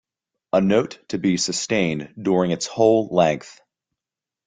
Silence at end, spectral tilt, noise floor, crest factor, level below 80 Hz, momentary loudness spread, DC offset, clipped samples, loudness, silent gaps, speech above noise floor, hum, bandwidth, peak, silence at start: 0.95 s; -5 dB/octave; -89 dBFS; 18 dB; -58 dBFS; 7 LU; under 0.1%; under 0.1%; -21 LUFS; none; 68 dB; none; 9.6 kHz; -2 dBFS; 0.55 s